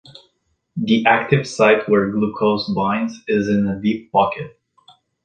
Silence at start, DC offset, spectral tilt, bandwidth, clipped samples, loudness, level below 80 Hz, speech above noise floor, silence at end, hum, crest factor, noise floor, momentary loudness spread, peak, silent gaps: 0.75 s; under 0.1%; -6.5 dB/octave; 9.2 kHz; under 0.1%; -18 LUFS; -54 dBFS; 50 dB; 0.75 s; none; 18 dB; -68 dBFS; 8 LU; -2 dBFS; none